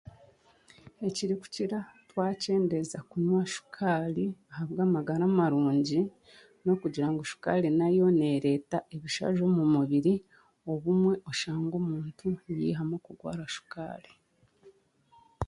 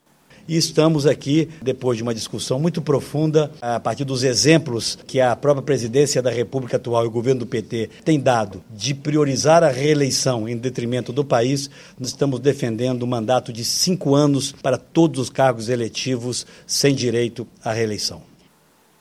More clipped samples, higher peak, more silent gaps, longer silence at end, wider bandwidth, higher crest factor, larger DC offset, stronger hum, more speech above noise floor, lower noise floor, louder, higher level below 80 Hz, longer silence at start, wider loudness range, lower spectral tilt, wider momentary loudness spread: neither; second, -12 dBFS vs 0 dBFS; neither; second, 0 s vs 0.8 s; second, 11.5 kHz vs 14.5 kHz; about the same, 18 dB vs 20 dB; neither; neither; about the same, 35 dB vs 37 dB; first, -63 dBFS vs -56 dBFS; second, -30 LUFS vs -20 LUFS; about the same, -60 dBFS vs -56 dBFS; first, 0.85 s vs 0.45 s; first, 7 LU vs 3 LU; first, -6.5 dB/octave vs -5 dB/octave; first, 12 LU vs 8 LU